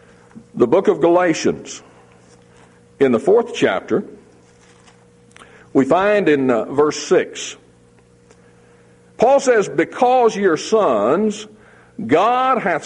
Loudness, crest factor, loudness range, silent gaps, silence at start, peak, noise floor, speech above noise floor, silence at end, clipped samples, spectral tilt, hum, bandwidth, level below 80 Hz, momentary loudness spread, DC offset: -16 LUFS; 16 dB; 4 LU; none; 0.35 s; -2 dBFS; -50 dBFS; 35 dB; 0 s; under 0.1%; -5 dB/octave; none; 10.5 kHz; -58 dBFS; 15 LU; under 0.1%